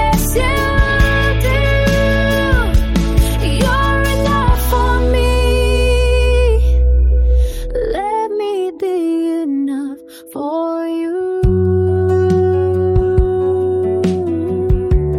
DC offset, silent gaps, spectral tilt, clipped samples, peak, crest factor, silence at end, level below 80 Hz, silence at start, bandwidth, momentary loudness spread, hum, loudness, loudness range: under 0.1%; none; -6 dB/octave; under 0.1%; 0 dBFS; 12 dB; 0 s; -16 dBFS; 0 s; 16.5 kHz; 6 LU; none; -15 LUFS; 5 LU